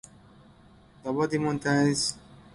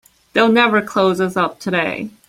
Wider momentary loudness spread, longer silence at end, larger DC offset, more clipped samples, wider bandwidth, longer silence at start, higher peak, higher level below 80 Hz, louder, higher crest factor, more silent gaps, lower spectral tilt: first, 13 LU vs 8 LU; first, 0.35 s vs 0.2 s; neither; neither; second, 11.5 kHz vs 15.5 kHz; first, 1.05 s vs 0.35 s; second, -12 dBFS vs -2 dBFS; about the same, -60 dBFS vs -58 dBFS; second, -27 LUFS vs -16 LUFS; about the same, 16 dB vs 16 dB; neither; about the same, -4.5 dB/octave vs -5.5 dB/octave